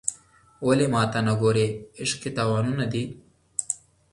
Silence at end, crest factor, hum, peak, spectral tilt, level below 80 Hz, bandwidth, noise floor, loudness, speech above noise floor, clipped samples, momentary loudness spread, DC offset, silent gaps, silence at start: 0.35 s; 22 dB; none; -4 dBFS; -5 dB/octave; -56 dBFS; 11.5 kHz; -51 dBFS; -25 LUFS; 28 dB; under 0.1%; 10 LU; under 0.1%; none; 0.05 s